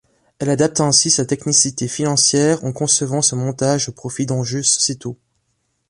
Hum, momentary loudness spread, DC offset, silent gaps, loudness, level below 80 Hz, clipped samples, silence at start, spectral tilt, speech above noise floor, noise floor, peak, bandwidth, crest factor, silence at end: none; 9 LU; under 0.1%; none; -16 LUFS; -56 dBFS; under 0.1%; 0.4 s; -3.5 dB/octave; 51 dB; -68 dBFS; 0 dBFS; 11.5 kHz; 18 dB; 0.75 s